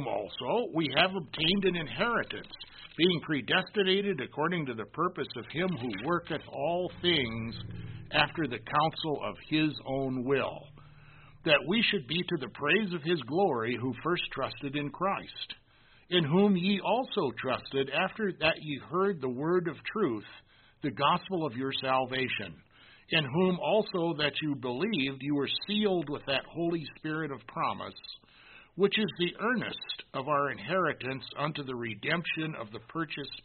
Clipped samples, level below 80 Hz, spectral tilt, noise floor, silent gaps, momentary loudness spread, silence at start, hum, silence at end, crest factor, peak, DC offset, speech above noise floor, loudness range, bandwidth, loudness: under 0.1%; -60 dBFS; -3 dB/octave; -61 dBFS; none; 11 LU; 0 s; none; 0.05 s; 24 dB; -8 dBFS; under 0.1%; 30 dB; 3 LU; 4.5 kHz; -31 LUFS